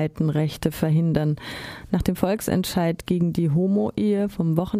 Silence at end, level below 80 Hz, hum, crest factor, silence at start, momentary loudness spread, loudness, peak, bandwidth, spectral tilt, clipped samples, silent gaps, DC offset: 0 s; -44 dBFS; none; 18 dB; 0 s; 5 LU; -23 LUFS; -4 dBFS; 15.5 kHz; -7 dB/octave; under 0.1%; none; under 0.1%